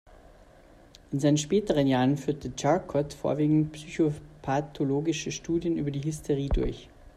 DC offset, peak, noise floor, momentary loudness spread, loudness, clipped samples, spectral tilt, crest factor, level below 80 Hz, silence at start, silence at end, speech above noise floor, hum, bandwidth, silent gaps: under 0.1%; -10 dBFS; -54 dBFS; 8 LU; -28 LUFS; under 0.1%; -6 dB/octave; 18 dB; -42 dBFS; 1.1 s; 0.1 s; 27 dB; none; 13.5 kHz; none